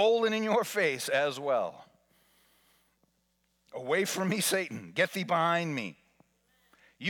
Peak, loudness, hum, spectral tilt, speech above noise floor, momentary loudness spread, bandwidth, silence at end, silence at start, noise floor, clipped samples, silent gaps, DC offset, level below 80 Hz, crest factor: -14 dBFS; -29 LUFS; none; -3.5 dB/octave; 46 dB; 10 LU; 19 kHz; 0 s; 0 s; -75 dBFS; under 0.1%; none; under 0.1%; -82 dBFS; 18 dB